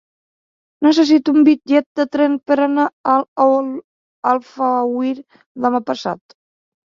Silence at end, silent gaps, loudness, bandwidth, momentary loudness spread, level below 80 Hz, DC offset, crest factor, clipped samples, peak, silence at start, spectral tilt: 0.7 s; 1.86-1.95 s, 2.93-3.04 s, 3.28-3.36 s, 3.84-4.23 s, 5.46-5.55 s; -16 LUFS; 7.4 kHz; 11 LU; -64 dBFS; under 0.1%; 16 dB; under 0.1%; -2 dBFS; 0.8 s; -5 dB/octave